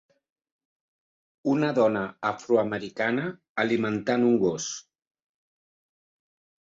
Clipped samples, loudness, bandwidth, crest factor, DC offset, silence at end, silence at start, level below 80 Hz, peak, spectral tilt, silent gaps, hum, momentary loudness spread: under 0.1%; -26 LUFS; 8 kHz; 18 dB; under 0.1%; 1.85 s; 1.45 s; -68 dBFS; -10 dBFS; -5 dB/octave; 3.49-3.55 s; none; 10 LU